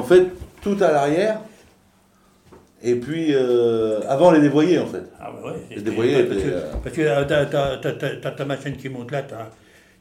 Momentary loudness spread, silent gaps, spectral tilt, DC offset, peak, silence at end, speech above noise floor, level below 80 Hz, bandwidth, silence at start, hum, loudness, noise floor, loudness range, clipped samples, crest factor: 16 LU; none; -6.5 dB/octave; under 0.1%; -2 dBFS; 0.5 s; 37 dB; -46 dBFS; 13.5 kHz; 0 s; none; -20 LUFS; -57 dBFS; 4 LU; under 0.1%; 18 dB